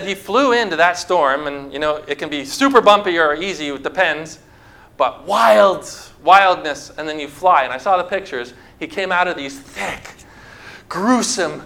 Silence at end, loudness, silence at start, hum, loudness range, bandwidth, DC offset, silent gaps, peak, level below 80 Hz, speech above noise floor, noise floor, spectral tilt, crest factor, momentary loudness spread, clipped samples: 0 s; -16 LUFS; 0 s; none; 6 LU; 16.5 kHz; under 0.1%; none; 0 dBFS; -52 dBFS; 28 dB; -45 dBFS; -3 dB/octave; 18 dB; 16 LU; under 0.1%